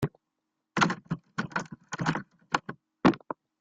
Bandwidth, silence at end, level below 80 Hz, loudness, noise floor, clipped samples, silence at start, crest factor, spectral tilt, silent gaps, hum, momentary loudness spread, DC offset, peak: 10 kHz; 0.45 s; -62 dBFS; -31 LUFS; -83 dBFS; under 0.1%; 0 s; 24 dB; -5.5 dB/octave; none; none; 12 LU; under 0.1%; -8 dBFS